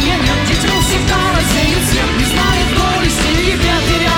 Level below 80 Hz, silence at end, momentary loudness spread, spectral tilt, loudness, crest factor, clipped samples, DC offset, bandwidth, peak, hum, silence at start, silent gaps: -20 dBFS; 0 s; 1 LU; -4 dB/octave; -13 LUFS; 10 dB; under 0.1%; 0.4%; over 20 kHz; -2 dBFS; none; 0 s; none